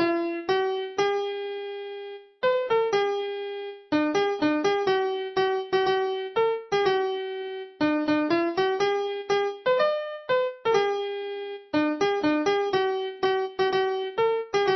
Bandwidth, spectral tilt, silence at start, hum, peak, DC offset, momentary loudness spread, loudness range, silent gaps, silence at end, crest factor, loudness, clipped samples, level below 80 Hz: 6.2 kHz; -4.5 dB/octave; 0 s; none; -10 dBFS; under 0.1%; 9 LU; 2 LU; none; 0 s; 16 dB; -26 LUFS; under 0.1%; -66 dBFS